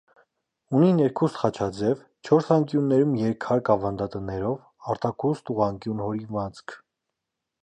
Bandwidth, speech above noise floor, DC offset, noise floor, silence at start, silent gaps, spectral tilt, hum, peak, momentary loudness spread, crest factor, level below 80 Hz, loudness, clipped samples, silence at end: 9.2 kHz; 60 dB; under 0.1%; -84 dBFS; 0.7 s; none; -8.5 dB/octave; none; -6 dBFS; 11 LU; 20 dB; -56 dBFS; -25 LUFS; under 0.1%; 0.85 s